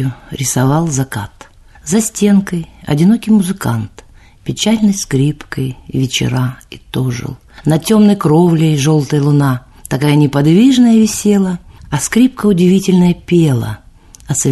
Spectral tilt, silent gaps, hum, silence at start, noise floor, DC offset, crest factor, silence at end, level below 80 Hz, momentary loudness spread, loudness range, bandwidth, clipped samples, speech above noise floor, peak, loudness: -6 dB/octave; none; none; 0 s; -39 dBFS; under 0.1%; 12 dB; 0 s; -40 dBFS; 13 LU; 5 LU; 12.5 kHz; under 0.1%; 27 dB; 0 dBFS; -13 LUFS